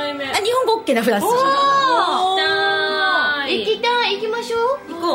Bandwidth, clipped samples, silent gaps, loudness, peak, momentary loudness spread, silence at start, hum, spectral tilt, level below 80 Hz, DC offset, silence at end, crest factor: 16 kHz; under 0.1%; none; -17 LUFS; -2 dBFS; 6 LU; 0 s; none; -2.5 dB/octave; -60 dBFS; under 0.1%; 0 s; 16 dB